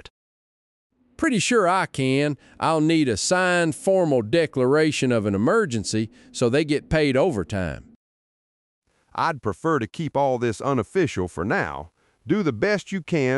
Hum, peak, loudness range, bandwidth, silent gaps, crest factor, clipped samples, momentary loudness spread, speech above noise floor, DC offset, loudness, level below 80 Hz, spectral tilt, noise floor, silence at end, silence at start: none; -8 dBFS; 5 LU; 11.5 kHz; 7.96-8.82 s; 14 dB; under 0.1%; 7 LU; over 68 dB; under 0.1%; -22 LUFS; -50 dBFS; -5 dB/octave; under -90 dBFS; 0 s; 1.2 s